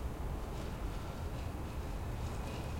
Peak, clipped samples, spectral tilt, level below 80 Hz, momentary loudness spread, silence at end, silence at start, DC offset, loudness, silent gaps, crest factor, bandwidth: -28 dBFS; under 0.1%; -6 dB/octave; -44 dBFS; 1 LU; 0 s; 0 s; under 0.1%; -42 LUFS; none; 12 dB; 16.5 kHz